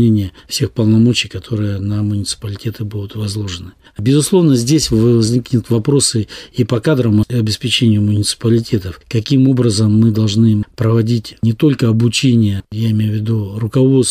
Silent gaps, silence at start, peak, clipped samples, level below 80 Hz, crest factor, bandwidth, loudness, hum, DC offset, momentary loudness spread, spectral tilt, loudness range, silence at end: none; 0 s; -2 dBFS; under 0.1%; -42 dBFS; 12 dB; 15 kHz; -14 LUFS; none; under 0.1%; 10 LU; -6 dB/octave; 4 LU; 0 s